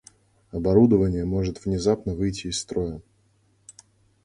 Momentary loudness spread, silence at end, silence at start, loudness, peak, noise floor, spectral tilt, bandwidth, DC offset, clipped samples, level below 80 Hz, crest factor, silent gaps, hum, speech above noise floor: 12 LU; 1.25 s; 0.55 s; -24 LUFS; -4 dBFS; -64 dBFS; -6.5 dB/octave; 11.5 kHz; under 0.1%; under 0.1%; -42 dBFS; 20 dB; none; none; 41 dB